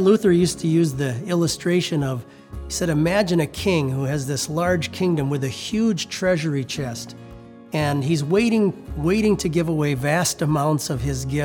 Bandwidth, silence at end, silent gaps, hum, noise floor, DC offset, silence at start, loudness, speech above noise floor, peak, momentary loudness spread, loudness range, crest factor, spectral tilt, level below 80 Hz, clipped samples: 19.5 kHz; 0 s; none; none; -41 dBFS; under 0.1%; 0 s; -21 LUFS; 21 dB; -6 dBFS; 8 LU; 3 LU; 16 dB; -5.5 dB/octave; -44 dBFS; under 0.1%